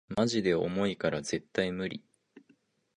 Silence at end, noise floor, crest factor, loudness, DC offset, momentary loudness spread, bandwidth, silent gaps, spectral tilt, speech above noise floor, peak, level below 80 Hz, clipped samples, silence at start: 0.6 s; -68 dBFS; 20 dB; -31 LUFS; under 0.1%; 9 LU; 10.5 kHz; none; -5 dB/octave; 38 dB; -12 dBFS; -62 dBFS; under 0.1%; 0.1 s